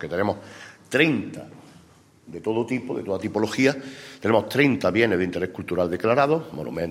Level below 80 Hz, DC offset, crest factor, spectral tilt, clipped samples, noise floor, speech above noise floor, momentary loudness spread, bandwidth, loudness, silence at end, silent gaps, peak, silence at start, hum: -60 dBFS; under 0.1%; 20 dB; -6 dB/octave; under 0.1%; -54 dBFS; 30 dB; 17 LU; 16 kHz; -23 LUFS; 0 s; none; -4 dBFS; 0 s; none